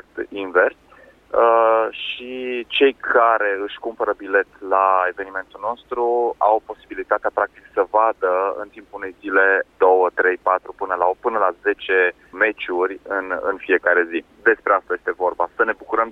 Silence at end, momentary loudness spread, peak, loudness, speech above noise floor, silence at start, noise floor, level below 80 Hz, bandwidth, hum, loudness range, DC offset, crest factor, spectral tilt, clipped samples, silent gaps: 0 s; 11 LU; -4 dBFS; -19 LUFS; 30 dB; 0.15 s; -49 dBFS; -60 dBFS; 4.3 kHz; none; 2 LU; under 0.1%; 16 dB; -5 dB/octave; under 0.1%; none